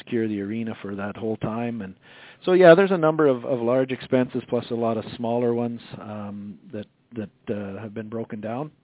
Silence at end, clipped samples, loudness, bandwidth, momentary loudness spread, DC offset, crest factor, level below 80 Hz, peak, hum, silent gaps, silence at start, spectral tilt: 0.15 s; under 0.1%; -23 LUFS; 4 kHz; 20 LU; under 0.1%; 22 dB; -62 dBFS; -2 dBFS; none; none; 0.05 s; -11 dB/octave